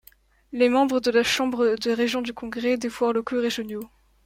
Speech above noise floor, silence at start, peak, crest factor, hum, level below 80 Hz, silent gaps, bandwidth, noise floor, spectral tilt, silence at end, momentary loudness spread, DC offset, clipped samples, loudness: 33 dB; 0.5 s; -8 dBFS; 16 dB; none; -58 dBFS; none; 16 kHz; -56 dBFS; -3.5 dB/octave; 0.4 s; 12 LU; under 0.1%; under 0.1%; -23 LUFS